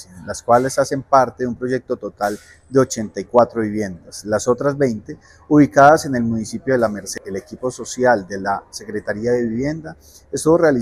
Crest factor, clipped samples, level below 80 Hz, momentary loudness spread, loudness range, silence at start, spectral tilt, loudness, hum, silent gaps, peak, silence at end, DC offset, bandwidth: 18 dB; under 0.1%; -50 dBFS; 14 LU; 5 LU; 0 s; -5.5 dB/octave; -18 LUFS; none; none; 0 dBFS; 0 s; under 0.1%; 15.5 kHz